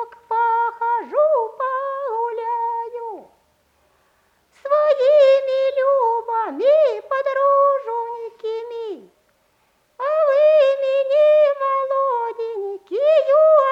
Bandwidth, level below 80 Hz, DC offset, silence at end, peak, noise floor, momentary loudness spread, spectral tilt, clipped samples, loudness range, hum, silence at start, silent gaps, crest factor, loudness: 6.2 kHz; -74 dBFS; under 0.1%; 0 s; -4 dBFS; -63 dBFS; 15 LU; -3.5 dB/octave; under 0.1%; 6 LU; none; 0 s; none; 14 dB; -18 LUFS